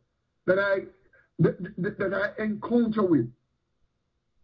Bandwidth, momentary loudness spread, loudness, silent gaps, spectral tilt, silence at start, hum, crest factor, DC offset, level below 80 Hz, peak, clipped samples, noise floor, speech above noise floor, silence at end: 5.4 kHz; 9 LU; -27 LUFS; none; -10 dB/octave; 0.45 s; none; 18 dB; under 0.1%; -62 dBFS; -10 dBFS; under 0.1%; -77 dBFS; 51 dB; 1.1 s